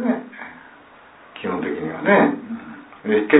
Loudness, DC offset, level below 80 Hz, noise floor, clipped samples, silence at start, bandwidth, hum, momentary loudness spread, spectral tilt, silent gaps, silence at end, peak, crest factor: -21 LUFS; under 0.1%; -64 dBFS; -47 dBFS; under 0.1%; 0 s; 4 kHz; none; 23 LU; -10.5 dB/octave; none; 0 s; 0 dBFS; 20 dB